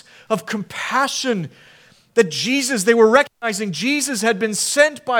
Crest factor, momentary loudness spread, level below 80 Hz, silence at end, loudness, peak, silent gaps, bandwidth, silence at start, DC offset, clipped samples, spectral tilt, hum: 18 dB; 11 LU; -68 dBFS; 0 s; -18 LUFS; 0 dBFS; none; 18.5 kHz; 0.3 s; under 0.1%; under 0.1%; -3 dB/octave; none